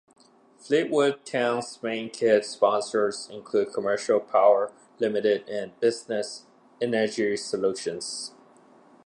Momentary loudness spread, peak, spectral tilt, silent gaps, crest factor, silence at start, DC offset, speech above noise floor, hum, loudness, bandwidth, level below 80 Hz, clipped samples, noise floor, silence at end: 11 LU; -6 dBFS; -4 dB/octave; none; 20 dB; 0.65 s; under 0.1%; 30 dB; none; -26 LUFS; 11 kHz; -76 dBFS; under 0.1%; -55 dBFS; 0.75 s